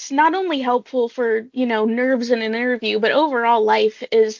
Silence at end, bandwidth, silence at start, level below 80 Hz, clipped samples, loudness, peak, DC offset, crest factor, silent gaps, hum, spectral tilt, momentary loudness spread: 0 s; 7.6 kHz; 0 s; -70 dBFS; under 0.1%; -19 LUFS; -4 dBFS; under 0.1%; 14 dB; none; none; -4 dB/octave; 5 LU